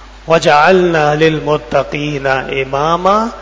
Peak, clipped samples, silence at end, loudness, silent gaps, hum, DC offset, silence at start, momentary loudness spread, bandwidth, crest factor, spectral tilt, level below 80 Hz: 0 dBFS; 0.3%; 0 s; -12 LUFS; none; none; under 0.1%; 0 s; 8 LU; 8 kHz; 12 dB; -5.5 dB/octave; -36 dBFS